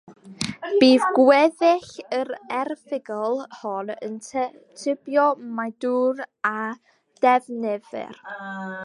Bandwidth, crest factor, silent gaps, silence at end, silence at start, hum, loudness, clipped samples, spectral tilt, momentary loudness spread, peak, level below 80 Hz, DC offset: 11.5 kHz; 20 dB; none; 0 s; 0.1 s; none; -23 LUFS; under 0.1%; -4.5 dB/octave; 16 LU; -4 dBFS; -70 dBFS; under 0.1%